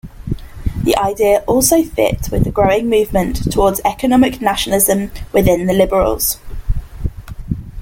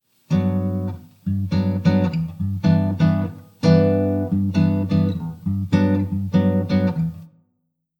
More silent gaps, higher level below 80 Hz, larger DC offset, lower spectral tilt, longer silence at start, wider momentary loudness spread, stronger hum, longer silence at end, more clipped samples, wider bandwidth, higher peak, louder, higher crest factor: neither; first, -26 dBFS vs -50 dBFS; neither; second, -4.5 dB/octave vs -9 dB/octave; second, 0.05 s vs 0.3 s; first, 13 LU vs 8 LU; neither; second, 0 s vs 0.7 s; neither; first, 17 kHz vs 7 kHz; first, 0 dBFS vs -4 dBFS; first, -15 LUFS vs -20 LUFS; about the same, 14 dB vs 16 dB